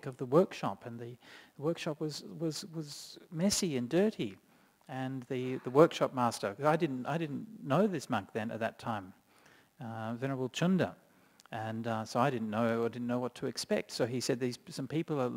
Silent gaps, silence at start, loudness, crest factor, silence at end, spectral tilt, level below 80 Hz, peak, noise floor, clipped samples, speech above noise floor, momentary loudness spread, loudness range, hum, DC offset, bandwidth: none; 0.05 s; -34 LUFS; 24 dB; 0 s; -5.5 dB/octave; -72 dBFS; -10 dBFS; -63 dBFS; under 0.1%; 30 dB; 13 LU; 5 LU; none; under 0.1%; 16 kHz